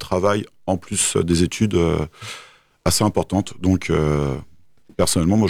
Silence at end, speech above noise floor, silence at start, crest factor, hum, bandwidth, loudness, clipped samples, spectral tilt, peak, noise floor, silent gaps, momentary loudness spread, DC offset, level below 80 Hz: 0 s; 33 dB; 0 s; 16 dB; none; 17.5 kHz; -20 LUFS; under 0.1%; -5 dB/octave; -4 dBFS; -53 dBFS; none; 12 LU; under 0.1%; -38 dBFS